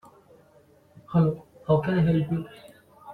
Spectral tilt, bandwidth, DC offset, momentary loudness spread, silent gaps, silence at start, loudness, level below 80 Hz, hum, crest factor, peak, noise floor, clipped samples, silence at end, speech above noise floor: -10 dB/octave; 4.4 kHz; under 0.1%; 11 LU; none; 1.1 s; -25 LUFS; -54 dBFS; none; 18 dB; -8 dBFS; -58 dBFS; under 0.1%; 0 s; 34 dB